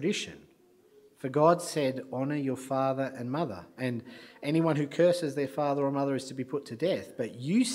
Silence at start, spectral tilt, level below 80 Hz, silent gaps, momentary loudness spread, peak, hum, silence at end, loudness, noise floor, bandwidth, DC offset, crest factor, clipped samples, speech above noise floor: 0 s; -6 dB/octave; -74 dBFS; none; 11 LU; -10 dBFS; none; 0 s; -30 LUFS; -62 dBFS; 16 kHz; under 0.1%; 20 dB; under 0.1%; 32 dB